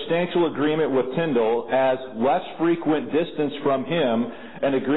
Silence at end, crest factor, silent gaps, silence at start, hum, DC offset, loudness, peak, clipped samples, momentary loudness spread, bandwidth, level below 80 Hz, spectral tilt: 0 s; 10 dB; none; 0 s; none; 0.7%; -23 LUFS; -12 dBFS; under 0.1%; 4 LU; 4.1 kHz; -64 dBFS; -11 dB/octave